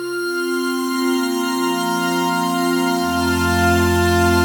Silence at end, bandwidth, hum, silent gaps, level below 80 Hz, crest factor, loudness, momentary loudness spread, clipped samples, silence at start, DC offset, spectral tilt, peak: 0 s; over 20 kHz; none; none; -44 dBFS; 14 dB; -18 LUFS; 5 LU; under 0.1%; 0 s; under 0.1%; -4.5 dB/octave; -4 dBFS